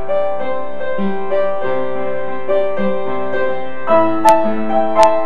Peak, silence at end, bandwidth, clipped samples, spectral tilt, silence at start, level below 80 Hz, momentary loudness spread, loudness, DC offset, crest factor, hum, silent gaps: 0 dBFS; 0 s; 13 kHz; under 0.1%; -5.5 dB/octave; 0 s; -54 dBFS; 10 LU; -17 LUFS; 20%; 18 dB; none; none